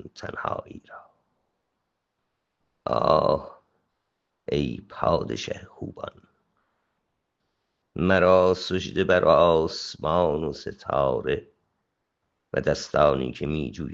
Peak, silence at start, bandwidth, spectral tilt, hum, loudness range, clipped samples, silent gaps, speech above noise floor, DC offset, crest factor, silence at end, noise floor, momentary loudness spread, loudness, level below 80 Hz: -2 dBFS; 0.05 s; 7.8 kHz; -6 dB/octave; none; 9 LU; under 0.1%; none; 55 dB; under 0.1%; 24 dB; 0 s; -79 dBFS; 18 LU; -24 LUFS; -50 dBFS